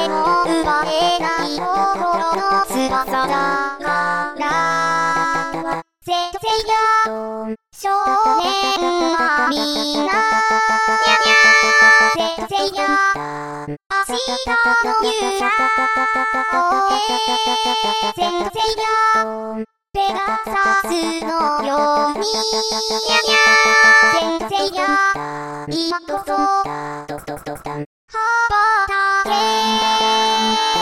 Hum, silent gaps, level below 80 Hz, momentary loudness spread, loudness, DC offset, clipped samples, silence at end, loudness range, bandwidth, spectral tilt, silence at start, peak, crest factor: none; 13.86-13.90 s, 27.86-28.08 s; -48 dBFS; 13 LU; -16 LUFS; 0.4%; under 0.1%; 0 s; 6 LU; 17 kHz; -2 dB/octave; 0 s; 0 dBFS; 18 dB